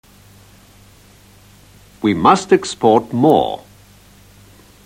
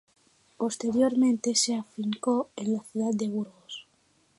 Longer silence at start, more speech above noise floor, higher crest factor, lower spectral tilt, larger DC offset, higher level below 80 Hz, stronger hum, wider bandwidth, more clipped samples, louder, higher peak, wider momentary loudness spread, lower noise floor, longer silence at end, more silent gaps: first, 2 s vs 0.6 s; second, 33 dB vs 40 dB; about the same, 18 dB vs 16 dB; first, -5.5 dB/octave vs -4 dB/octave; neither; first, -52 dBFS vs -74 dBFS; first, 50 Hz at -45 dBFS vs none; first, 16.5 kHz vs 11.5 kHz; neither; first, -15 LUFS vs -28 LUFS; first, 0 dBFS vs -12 dBFS; second, 9 LU vs 13 LU; second, -46 dBFS vs -67 dBFS; first, 1.3 s vs 0.55 s; neither